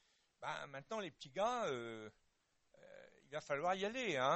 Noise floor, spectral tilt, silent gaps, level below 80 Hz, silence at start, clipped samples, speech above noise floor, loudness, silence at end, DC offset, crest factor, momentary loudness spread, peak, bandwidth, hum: -80 dBFS; -4 dB/octave; none; -80 dBFS; 0.4 s; under 0.1%; 39 dB; -43 LUFS; 0 s; under 0.1%; 20 dB; 21 LU; -22 dBFS; 8.2 kHz; none